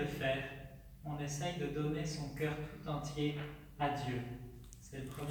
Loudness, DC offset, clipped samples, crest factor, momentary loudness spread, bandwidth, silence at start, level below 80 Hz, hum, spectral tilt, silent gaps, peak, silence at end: -40 LUFS; under 0.1%; under 0.1%; 18 dB; 13 LU; over 20 kHz; 0 s; -56 dBFS; none; -5.5 dB/octave; none; -24 dBFS; 0 s